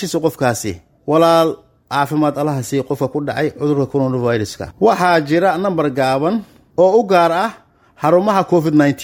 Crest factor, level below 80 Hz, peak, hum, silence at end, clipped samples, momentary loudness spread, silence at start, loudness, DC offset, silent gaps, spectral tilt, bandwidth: 14 dB; -52 dBFS; 0 dBFS; none; 0 s; under 0.1%; 9 LU; 0 s; -16 LUFS; under 0.1%; none; -6 dB/octave; 19.5 kHz